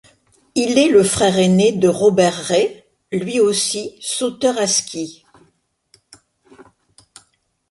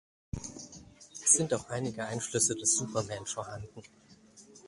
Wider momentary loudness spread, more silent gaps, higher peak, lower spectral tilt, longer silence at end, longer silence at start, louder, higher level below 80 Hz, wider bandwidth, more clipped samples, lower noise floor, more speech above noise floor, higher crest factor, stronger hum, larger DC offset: second, 12 LU vs 23 LU; neither; first, -2 dBFS vs -10 dBFS; about the same, -4 dB/octave vs -3 dB/octave; first, 1.1 s vs 0.1 s; first, 0.55 s vs 0.35 s; first, -16 LUFS vs -29 LUFS; about the same, -54 dBFS vs -58 dBFS; about the same, 11.5 kHz vs 11.5 kHz; neither; first, -62 dBFS vs -57 dBFS; first, 47 dB vs 24 dB; second, 16 dB vs 24 dB; neither; neither